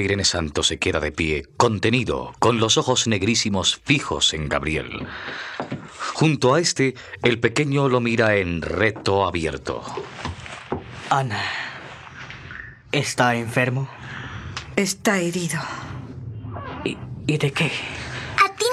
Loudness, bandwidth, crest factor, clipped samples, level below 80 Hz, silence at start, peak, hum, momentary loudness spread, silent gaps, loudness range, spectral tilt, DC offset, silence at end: -22 LUFS; 14 kHz; 22 dB; under 0.1%; -46 dBFS; 0 s; -2 dBFS; none; 15 LU; none; 6 LU; -4 dB/octave; under 0.1%; 0 s